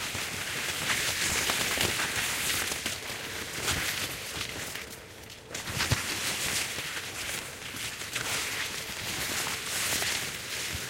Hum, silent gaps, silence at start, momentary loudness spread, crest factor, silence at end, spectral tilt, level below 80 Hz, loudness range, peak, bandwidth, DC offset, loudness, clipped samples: none; none; 0 s; 9 LU; 20 dB; 0 s; -1 dB/octave; -52 dBFS; 4 LU; -12 dBFS; 17 kHz; under 0.1%; -30 LUFS; under 0.1%